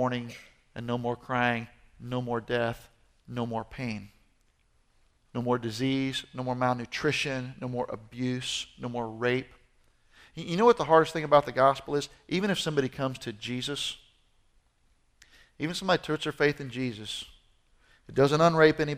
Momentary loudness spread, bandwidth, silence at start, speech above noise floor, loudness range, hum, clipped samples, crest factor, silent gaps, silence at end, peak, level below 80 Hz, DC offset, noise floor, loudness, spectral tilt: 15 LU; 15.5 kHz; 0 s; 39 dB; 9 LU; none; under 0.1%; 24 dB; none; 0 s; -6 dBFS; -60 dBFS; under 0.1%; -67 dBFS; -28 LUFS; -5 dB/octave